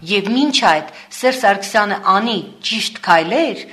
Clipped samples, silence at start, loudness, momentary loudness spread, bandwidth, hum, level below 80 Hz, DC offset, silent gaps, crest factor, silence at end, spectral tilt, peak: under 0.1%; 0 s; -15 LUFS; 7 LU; 13.5 kHz; none; -64 dBFS; under 0.1%; none; 16 dB; 0 s; -3 dB/octave; 0 dBFS